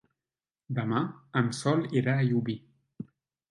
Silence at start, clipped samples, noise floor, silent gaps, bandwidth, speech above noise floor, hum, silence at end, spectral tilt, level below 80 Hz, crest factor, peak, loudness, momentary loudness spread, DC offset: 0.7 s; under 0.1%; under -90 dBFS; none; 11.5 kHz; over 62 dB; none; 0.45 s; -7 dB/octave; -70 dBFS; 18 dB; -12 dBFS; -29 LUFS; 19 LU; under 0.1%